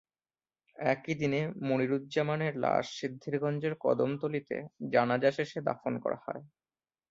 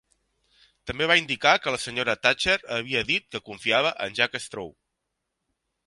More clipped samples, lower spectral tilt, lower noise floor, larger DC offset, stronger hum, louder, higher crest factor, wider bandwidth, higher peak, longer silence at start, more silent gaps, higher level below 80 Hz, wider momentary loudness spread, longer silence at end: neither; first, -6.5 dB/octave vs -2.5 dB/octave; first, under -90 dBFS vs -81 dBFS; neither; neither; second, -32 LUFS vs -23 LUFS; about the same, 20 dB vs 24 dB; second, 7.8 kHz vs 11.5 kHz; second, -12 dBFS vs -2 dBFS; about the same, 0.8 s vs 0.85 s; neither; second, -72 dBFS vs -56 dBFS; second, 9 LU vs 15 LU; second, 0.65 s vs 1.15 s